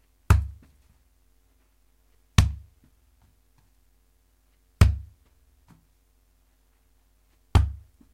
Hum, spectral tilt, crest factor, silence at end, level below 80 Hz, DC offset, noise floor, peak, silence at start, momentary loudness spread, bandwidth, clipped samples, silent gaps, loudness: none; -5.5 dB/octave; 28 dB; 0.35 s; -32 dBFS; under 0.1%; -64 dBFS; 0 dBFS; 0.3 s; 17 LU; 15.5 kHz; under 0.1%; none; -25 LUFS